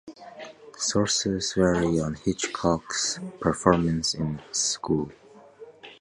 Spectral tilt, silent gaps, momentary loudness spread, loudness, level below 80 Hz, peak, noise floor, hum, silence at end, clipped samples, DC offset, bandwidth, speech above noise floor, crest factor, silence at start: -4 dB/octave; none; 20 LU; -25 LUFS; -48 dBFS; -2 dBFS; -48 dBFS; none; 0.05 s; under 0.1%; under 0.1%; 11.5 kHz; 23 dB; 24 dB; 0.05 s